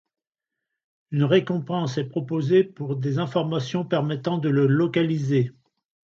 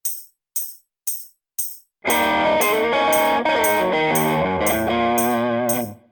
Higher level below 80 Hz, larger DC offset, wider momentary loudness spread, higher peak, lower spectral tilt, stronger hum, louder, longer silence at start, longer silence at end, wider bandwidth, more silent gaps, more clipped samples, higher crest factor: second, -68 dBFS vs -52 dBFS; neither; second, 7 LU vs 11 LU; about the same, -6 dBFS vs -6 dBFS; first, -7.5 dB/octave vs -3.5 dB/octave; neither; second, -24 LUFS vs -20 LUFS; first, 1.1 s vs 0.05 s; first, 0.65 s vs 0.15 s; second, 7.4 kHz vs over 20 kHz; neither; neither; about the same, 16 dB vs 14 dB